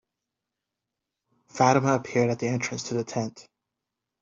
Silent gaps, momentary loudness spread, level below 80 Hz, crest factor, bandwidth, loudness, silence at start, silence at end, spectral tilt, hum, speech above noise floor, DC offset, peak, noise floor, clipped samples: none; 11 LU; -66 dBFS; 24 dB; 7.8 kHz; -25 LUFS; 1.55 s; 0.8 s; -5.5 dB/octave; none; 61 dB; under 0.1%; -4 dBFS; -86 dBFS; under 0.1%